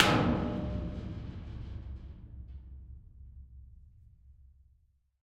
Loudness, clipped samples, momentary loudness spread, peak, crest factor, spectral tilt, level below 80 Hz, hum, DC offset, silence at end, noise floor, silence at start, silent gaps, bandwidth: -35 LUFS; under 0.1%; 23 LU; -4 dBFS; 32 dB; -5.5 dB/octave; -46 dBFS; none; under 0.1%; 0.8 s; -69 dBFS; 0 s; none; 13.5 kHz